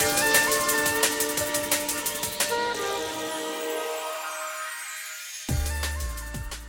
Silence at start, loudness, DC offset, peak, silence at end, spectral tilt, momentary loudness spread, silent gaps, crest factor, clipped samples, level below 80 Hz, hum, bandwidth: 0 s; -26 LUFS; under 0.1%; -6 dBFS; 0 s; -2 dB/octave; 13 LU; none; 20 dB; under 0.1%; -40 dBFS; none; 17 kHz